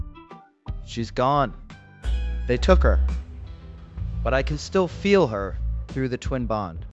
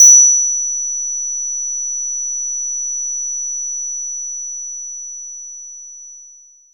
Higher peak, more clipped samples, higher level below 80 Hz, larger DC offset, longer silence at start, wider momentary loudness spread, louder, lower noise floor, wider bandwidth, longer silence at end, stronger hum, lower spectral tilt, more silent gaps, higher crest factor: about the same, -2 dBFS vs 0 dBFS; neither; first, -28 dBFS vs under -90 dBFS; second, under 0.1% vs 0.6%; about the same, 0 s vs 0 s; first, 20 LU vs 17 LU; second, -24 LUFS vs -15 LUFS; about the same, -46 dBFS vs -44 dBFS; second, 8 kHz vs 19 kHz; second, 0 s vs 0.35 s; neither; first, -6.5 dB/octave vs 4.5 dB/octave; neither; about the same, 22 dB vs 18 dB